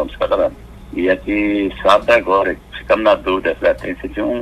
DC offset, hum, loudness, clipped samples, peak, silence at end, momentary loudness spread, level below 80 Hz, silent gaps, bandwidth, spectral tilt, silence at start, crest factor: under 0.1%; none; -16 LUFS; under 0.1%; 0 dBFS; 0 s; 9 LU; -38 dBFS; none; 13 kHz; -5.5 dB/octave; 0 s; 16 dB